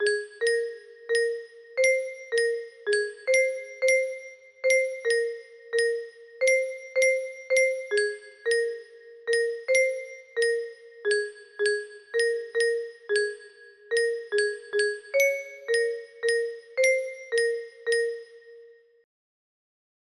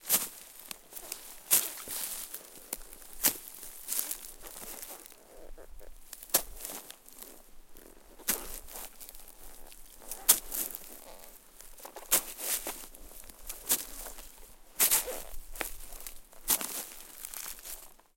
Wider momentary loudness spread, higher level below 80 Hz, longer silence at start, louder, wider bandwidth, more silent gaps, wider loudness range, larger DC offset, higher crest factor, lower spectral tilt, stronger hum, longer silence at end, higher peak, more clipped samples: second, 10 LU vs 24 LU; second, -76 dBFS vs -54 dBFS; about the same, 0 s vs 0 s; first, -26 LUFS vs -32 LUFS; second, 12 kHz vs 17 kHz; neither; second, 2 LU vs 7 LU; neither; second, 16 dB vs 32 dB; about the same, 0.5 dB/octave vs 0.5 dB/octave; neither; first, 1.35 s vs 0.2 s; second, -10 dBFS vs -4 dBFS; neither